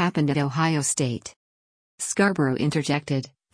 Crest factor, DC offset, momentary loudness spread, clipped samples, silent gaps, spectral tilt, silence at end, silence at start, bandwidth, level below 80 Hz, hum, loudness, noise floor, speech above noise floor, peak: 16 dB; under 0.1%; 9 LU; under 0.1%; 1.36-1.98 s; -5 dB/octave; 0.25 s; 0 s; 10.5 kHz; -62 dBFS; none; -24 LUFS; under -90 dBFS; over 66 dB; -8 dBFS